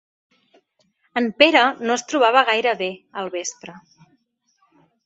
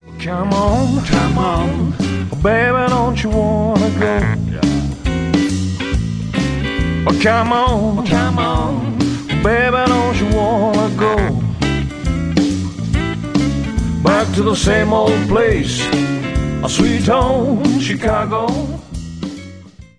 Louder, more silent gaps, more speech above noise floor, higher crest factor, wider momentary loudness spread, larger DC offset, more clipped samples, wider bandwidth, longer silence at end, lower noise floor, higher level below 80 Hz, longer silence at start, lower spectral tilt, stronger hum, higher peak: second, -19 LUFS vs -16 LUFS; neither; first, 47 dB vs 22 dB; first, 22 dB vs 16 dB; first, 17 LU vs 6 LU; neither; neither; second, 8.4 kHz vs 11 kHz; first, 1.25 s vs 0.15 s; first, -66 dBFS vs -37 dBFS; second, -70 dBFS vs -26 dBFS; first, 1.15 s vs 0.05 s; second, -2 dB/octave vs -6 dB/octave; neither; about the same, 0 dBFS vs 0 dBFS